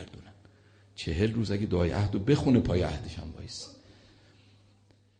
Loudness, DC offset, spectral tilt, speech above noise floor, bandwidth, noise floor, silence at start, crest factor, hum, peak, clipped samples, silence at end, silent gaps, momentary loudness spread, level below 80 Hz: -29 LUFS; under 0.1%; -7 dB/octave; 35 dB; 9.6 kHz; -63 dBFS; 0 s; 20 dB; none; -12 dBFS; under 0.1%; 1.45 s; none; 17 LU; -46 dBFS